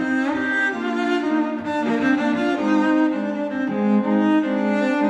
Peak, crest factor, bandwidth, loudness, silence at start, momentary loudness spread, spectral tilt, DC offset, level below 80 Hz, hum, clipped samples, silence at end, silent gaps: -8 dBFS; 12 dB; 8.4 kHz; -20 LUFS; 0 s; 5 LU; -6.5 dB/octave; under 0.1%; -64 dBFS; none; under 0.1%; 0 s; none